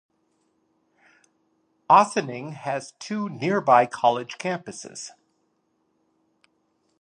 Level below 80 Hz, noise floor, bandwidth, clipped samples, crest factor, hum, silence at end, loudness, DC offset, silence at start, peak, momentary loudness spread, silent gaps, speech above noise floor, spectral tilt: -78 dBFS; -71 dBFS; 11 kHz; under 0.1%; 24 dB; none; 1.95 s; -23 LUFS; under 0.1%; 1.9 s; -2 dBFS; 19 LU; none; 48 dB; -4.5 dB/octave